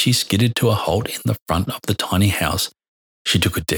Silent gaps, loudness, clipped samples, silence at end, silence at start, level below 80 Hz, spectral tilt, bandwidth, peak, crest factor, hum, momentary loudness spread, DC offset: 1.42-1.46 s, 2.88-3.25 s; -19 LUFS; under 0.1%; 0 s; 0 s; -40 dBFS; -4.5 dB/octave; over 20 kHz; -2 dBFS; 18 dB; none; 6 LU; under 0.1%